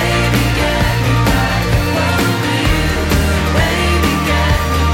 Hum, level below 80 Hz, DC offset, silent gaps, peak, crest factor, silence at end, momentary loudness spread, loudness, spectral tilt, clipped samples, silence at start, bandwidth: none; -20 dBFS; under 0.1%; none; -2 dBFS; 12 dB; 0 s; 1 LU; -14 LUFS; -5 dB/octave; under 0.1%; 0 s; 16.5 kHz